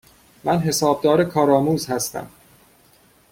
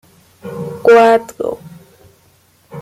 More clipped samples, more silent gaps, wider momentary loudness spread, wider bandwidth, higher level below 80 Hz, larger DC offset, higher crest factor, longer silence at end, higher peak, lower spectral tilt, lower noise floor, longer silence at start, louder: neither; neither; second, 10 LU vs 25 LU; about the same, 16.5 kHz vs 15 kHz; about the same, -54 dBFS vs -58 dBFS; neither; about the same, 18 dB vs 14 dB; first, 1.05 s vs 0 s; about the same, -4 dBFS vs -2 dBFS; about the same, -5 dB/octave vs -5.5 dB/octave; about the same, -55 dBFS vs -52 dBFS; about the same, 0.45 s vs 0.45 s; second, -19 LUFS vs -12 LUFS